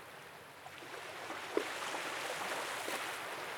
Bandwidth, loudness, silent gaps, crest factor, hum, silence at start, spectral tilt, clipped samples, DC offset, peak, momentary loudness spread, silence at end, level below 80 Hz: 19.5 kHz; -40 LUFS; none; 22 dB; none; 0 s; -1.5 dB/octave; under 0.1%; under 0.1%; -20 dBFS; 12 LU; 0 s; -84 dBFS